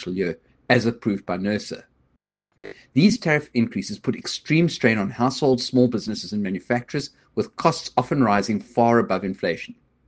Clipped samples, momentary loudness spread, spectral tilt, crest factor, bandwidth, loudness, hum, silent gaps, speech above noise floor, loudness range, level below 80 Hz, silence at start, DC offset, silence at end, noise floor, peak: under 0.1%; 11 LU; -6 dB/octave; 22 dB; 9.4 kHz; -22 LUFS; none; none; 48 dB; 3 LU; -58 dBFS; 0 s; under 0.1%; 0.35 s; -70 dBFS; 0 dBFS